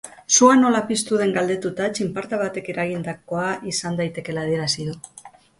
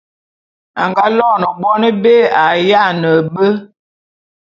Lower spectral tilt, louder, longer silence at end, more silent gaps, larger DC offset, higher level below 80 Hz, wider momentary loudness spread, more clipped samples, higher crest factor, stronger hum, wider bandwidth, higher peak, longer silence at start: second, -3.5 dB/octave vs -7 dB/octave; second, -21 LUFS vs -12 LUFS; second, 0.3 s vs 0.95 s; neither; neither; about the same, -60 dBFS vs -60 dBFS; first, 13 LU vs 6 LU; neither; first, 20 dB vs 14 dB; neither; first, 11.5 kHz vs 7.2 kHz; about the same, 0 dBFS vs 0 dBFS; second, 0.05 s vs 0.75 s